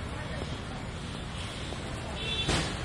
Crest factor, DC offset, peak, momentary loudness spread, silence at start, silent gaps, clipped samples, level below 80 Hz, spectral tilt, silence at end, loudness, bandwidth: 18 dB; under 0.1%; -16 dBFS; 10 LU; 0 s; none; under 0.1%; -44 dBFS; -4 dB/octave; 0 s; -34 LUFS; 11.5 kHz